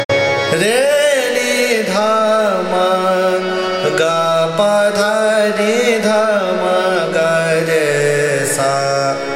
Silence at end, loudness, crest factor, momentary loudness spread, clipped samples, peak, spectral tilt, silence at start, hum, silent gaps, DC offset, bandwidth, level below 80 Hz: 0 s; -14 LUFS; 14 dB; 2 LU; under 0.1%; 0 dBFS; -3.5 dB/octave; 0 s; none; 0.05-0.09 s; under 0.1%; 16 kHz; -58 dBFS